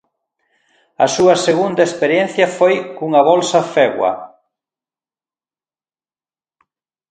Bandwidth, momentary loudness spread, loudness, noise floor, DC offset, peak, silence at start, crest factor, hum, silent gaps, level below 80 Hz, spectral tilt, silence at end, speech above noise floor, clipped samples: 9.4 kHz; 7 LU; -14 LUFS; under -90 dBFS; under 0.1%; 0 dBFS; 1 s; 18 dB; none; none; -62 dBFS; -4 dB/octave; 2.85 s; over 76 dB; under 0.1%